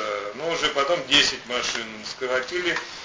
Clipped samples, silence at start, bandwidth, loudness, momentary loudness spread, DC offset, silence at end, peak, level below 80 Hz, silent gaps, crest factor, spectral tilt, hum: under 0.1%; 0 s; 7.8 kHz; -23 LUFS; 11 LU; under 0.1%; 0 s; -6 dBFS; -58 dBFS; none; 20 dB; -1.5 dB/octave; none